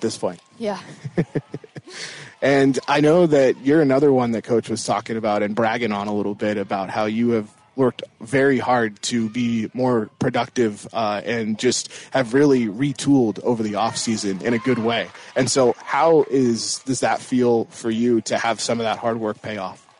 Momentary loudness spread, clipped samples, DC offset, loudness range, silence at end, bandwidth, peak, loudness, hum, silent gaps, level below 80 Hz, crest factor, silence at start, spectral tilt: 11 LU; under 0.1%; under 0.1%; 4 LU; 0.25 s; 11 kHz; -6 dBFS; -20 LUFS; none; none; -60 dBFS; 14 dB; 0 s; -5 dB/octave